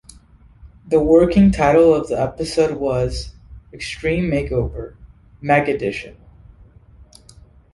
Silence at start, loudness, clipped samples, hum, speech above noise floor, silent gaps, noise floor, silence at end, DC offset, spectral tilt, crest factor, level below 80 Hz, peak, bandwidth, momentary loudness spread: 0.65 s; -17 LUFS; under 0.1%; none; 31 dB; none; -48 dBFS; 1.6 s; under 0.1%; -7 dB/octave; 18 dB; -36 dBFS; -2 dBFS; 11.5 kHz; 18 LU